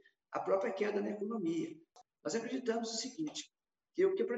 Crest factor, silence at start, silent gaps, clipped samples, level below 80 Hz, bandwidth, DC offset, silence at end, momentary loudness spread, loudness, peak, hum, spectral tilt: 18 dB; 0.3 s; none; under 0.1%; -88 dBFS; 8.4 kHz; under 0.1%; 0 s; 12 LU; -38 LUFS; -20 dBFS; none; -4 dB/octave